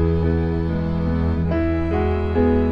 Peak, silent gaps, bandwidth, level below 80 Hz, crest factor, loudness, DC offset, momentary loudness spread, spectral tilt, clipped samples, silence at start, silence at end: -6 dBFS; none; 5.4 kHz; -26 dBFS; 12 dB; -21 LUFS; 0.5%; 4 LU; -10.5 dB/octave; under 0.1%; 0 s; 0 s